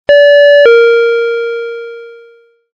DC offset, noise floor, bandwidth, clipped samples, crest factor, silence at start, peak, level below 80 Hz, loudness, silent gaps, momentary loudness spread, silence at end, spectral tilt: under 0.1%; -43 dBFS; 6.8 kHz; under 0.1%; 8 dB; 0.1 s; 0 dBFS; -52 dBFS; -7 LUFS; none; 18 LU; 0.65 s; -2 dB/octave